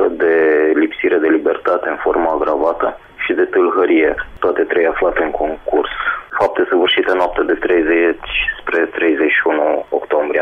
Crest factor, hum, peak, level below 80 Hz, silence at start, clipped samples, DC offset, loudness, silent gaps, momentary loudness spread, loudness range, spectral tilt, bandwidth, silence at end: 10 dB; none; -4 dBFS; -42 dBFS; 0 s; under 0.1%; under 0.1%; -15 LUFS; none; 6 LU; 1 LU; -6 dB/octave; 5.4 kHz; 0 s